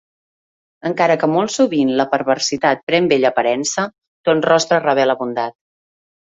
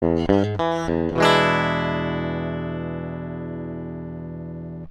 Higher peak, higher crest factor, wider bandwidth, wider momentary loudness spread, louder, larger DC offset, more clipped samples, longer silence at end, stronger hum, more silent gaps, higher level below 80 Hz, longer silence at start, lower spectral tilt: about the same, -2 dBFS vs -2 dBFS; second, 16 dB vs 22 dB; second, 8 kHz vs 12 kHz; second, 9 LU vs 16 LU; first, -17 LUFS vs -23 LUFS; neither; neither; first, 0.8 s vs 0 s; neither; first, 2.83-2.87 s, 4.07-4.24 s vs none; second, -62 dBFS vs -44 dBFS; first, 0.85 s vs 0 s; second, -4 dB/octave vs -6 dB/octave